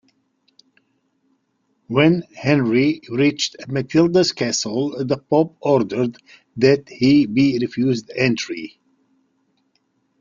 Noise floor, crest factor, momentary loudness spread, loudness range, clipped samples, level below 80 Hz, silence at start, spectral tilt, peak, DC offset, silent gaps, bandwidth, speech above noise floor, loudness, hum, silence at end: -68 dBFS; 18 dB; 8 LU; 2 LU; under 0.1%; -58 dBFS; 1.9 s; -5.5 dB/octave; -2 dBFS; under 0.1%; none; 7.6 kHz; 50 dB; -19 LUFS; none; 1.55 s